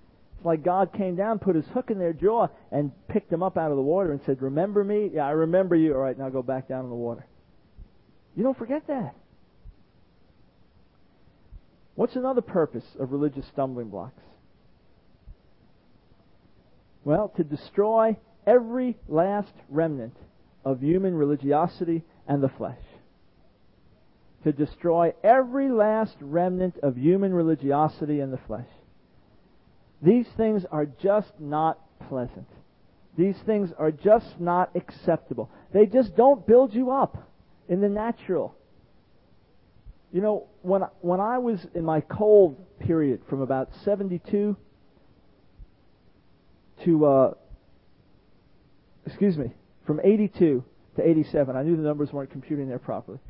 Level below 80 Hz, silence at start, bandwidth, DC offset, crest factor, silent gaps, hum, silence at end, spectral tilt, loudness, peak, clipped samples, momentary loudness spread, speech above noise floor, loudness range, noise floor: -56 dBFS; 0.35 s; 5.6 kHz; under 0.1%; 20 dB; none; none; 0 s; -12.5 dB/octave; -25 LUFS; -6 dBFS; under 0.1%; 13 LU; 36 dB; 10 LU; -60 dBFS